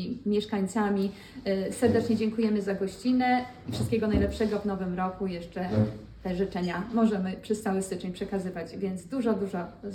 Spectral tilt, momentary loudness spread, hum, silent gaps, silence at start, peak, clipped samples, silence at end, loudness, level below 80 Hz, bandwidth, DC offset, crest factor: -6.5 dB/octave; 9 LU; none; none; 0 s; -12 dBFS; under 0.1%; 0 s; -29 LUFS; -50 dBFS; 13.5 kHz; under 0.1%; 16 dB